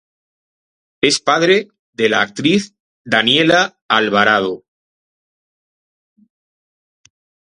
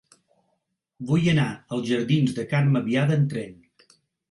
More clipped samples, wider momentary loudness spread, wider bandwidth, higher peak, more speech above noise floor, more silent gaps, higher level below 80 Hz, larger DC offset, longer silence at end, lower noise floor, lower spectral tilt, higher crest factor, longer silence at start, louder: neither; about the same, 9 LU vs 10 LU; about the same, 11.5 kHz vs 11.5 kHz; first, 0 dBFS vs -10 dBFS; first, over 76 dB vs 53 dB; first, 1.79-1.93 s, 2.80-3.05 s, 3.82-3.89 s vs none; about the same, -60 dBFS vs -60 dBFS; neither; first, 3 s vs 0.75 s; first, under -90 dBFS vs -76 dBFS; second, -3.5 dB/octave vs -7 dB/octave; about the same, 18 dB vs 16 dB; about the same, 1.05 s vs 1 s; first, -14 LUFS vs -23 LUFS